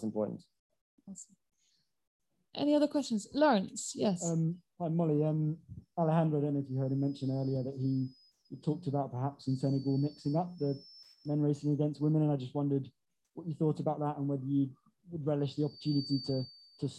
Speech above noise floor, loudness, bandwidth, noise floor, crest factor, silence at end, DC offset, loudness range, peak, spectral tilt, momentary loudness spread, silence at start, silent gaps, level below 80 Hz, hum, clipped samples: 44 dB; -33 LUFS; 11.5 kHz; -77 dBFS; 18 dB; 0 s; under 0.1%; 3 LU; -16 dBFS; -7 dB/octave; 14 LU; 0 s; 0.59-0.70 s, 0.81-0.98 s, 2.07-2.20 s; -72 dBFS; none; under 0.1%